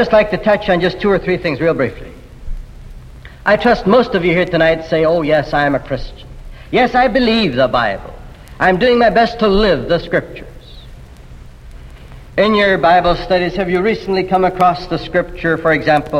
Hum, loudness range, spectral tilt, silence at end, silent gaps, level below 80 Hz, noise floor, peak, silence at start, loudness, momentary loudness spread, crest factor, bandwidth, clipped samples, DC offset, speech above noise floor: none; 4 LU; -7 dB/octave; 0 s; none; -32 dBFS; -35 dBFS; 0 dBFS; 0 s; -14 LUFS; 10 LU; 14 dB; 12.5 kHz; under 0.1%; under 0.1%; 22 dB